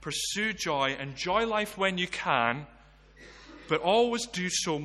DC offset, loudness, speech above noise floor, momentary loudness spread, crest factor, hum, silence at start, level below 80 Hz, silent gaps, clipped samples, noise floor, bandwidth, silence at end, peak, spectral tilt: under 0.1%; -28 LUFS; 25 dB; 7 LU; 20 dB; none; 0 s; -58 dBFS; none; under 0.1%; -54 dBFS; 12.5 kHz; 0 s; -10 dBFS; -3 dB/octave